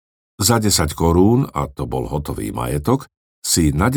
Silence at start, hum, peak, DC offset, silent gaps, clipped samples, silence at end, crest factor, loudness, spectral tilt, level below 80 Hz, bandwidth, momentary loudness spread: 0.4 s; none; 0 dBFS; under 0.1%; 3.17-3.42 s; under 0.1%; 0 s; 18 dB; -18 LUFS; -5 dB/octave; -34 dBFS; over 20 kHz; 10 LU